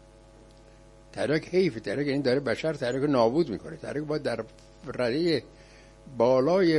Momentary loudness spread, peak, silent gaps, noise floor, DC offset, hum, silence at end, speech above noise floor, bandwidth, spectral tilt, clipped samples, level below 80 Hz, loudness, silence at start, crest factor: 13 LU; -10 dBFS; none; -52 dBFS; under 0.1%; none; 0 s; 26 dB; 11.5 kHz; -6.5 dB/octave; under 0.1%; -56 dBFS; -27 LUFS; 1.15 s; 18 dB